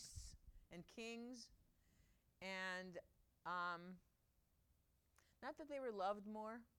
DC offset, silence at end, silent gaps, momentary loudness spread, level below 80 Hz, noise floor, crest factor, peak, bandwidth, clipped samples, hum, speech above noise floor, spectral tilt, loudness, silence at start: under 0.1%; 0.1 s; none; 15 LU; -72 dBFS; -82 dBFS; 20 dB; -34 dBFS; 17.5 kHz; under 0.1%; none; 31 dB; -4 dB/octave; -51 LUFS; 0 s